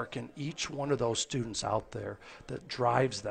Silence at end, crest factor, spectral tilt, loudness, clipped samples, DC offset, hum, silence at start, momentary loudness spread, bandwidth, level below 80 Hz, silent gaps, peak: 0 s; 22 dB; -4.5 dB/octave; -33 LUFS; under 0.1%; under 0.1%; none; 0 s; 14 LU; 9.4 kHz; -60 dBFS; none; -12 dBFS